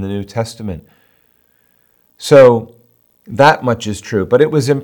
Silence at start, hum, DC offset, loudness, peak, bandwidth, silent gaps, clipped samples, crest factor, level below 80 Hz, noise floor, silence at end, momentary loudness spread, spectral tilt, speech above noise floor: 0 s; none; under 0.1%; -12 LUFS; 0 dBFS; 19.5 kHz; none; 0.5%; 14 dB; -52 dBFS; -56 dBFS; 0 s; 20 LU; -6 dB/octave; 44 dB